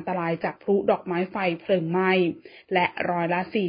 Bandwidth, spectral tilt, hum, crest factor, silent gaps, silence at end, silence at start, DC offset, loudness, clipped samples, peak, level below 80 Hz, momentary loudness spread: 5.2 kHz; -11 dB/octave; none; 18 dB; none; 0 s; 0 s; under 0.1%; -25 LUFS; under 0.1%; -8 dBFS; -66 dBFS; 6 LU